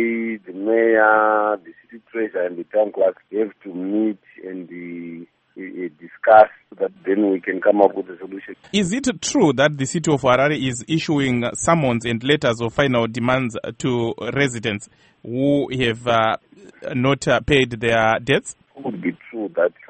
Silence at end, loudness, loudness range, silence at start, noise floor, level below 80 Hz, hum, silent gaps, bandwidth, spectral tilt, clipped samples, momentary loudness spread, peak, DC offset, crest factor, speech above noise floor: 0.2 s; -19 LUFS; 5 LU; 0 s; -43 dBFS; -50 dBFS; none; none; 8.8 kHz; -5 dB/octave; under 0.1%; 16 LU; 0 dBFS; under 0.1%; 20 dB; 23 dB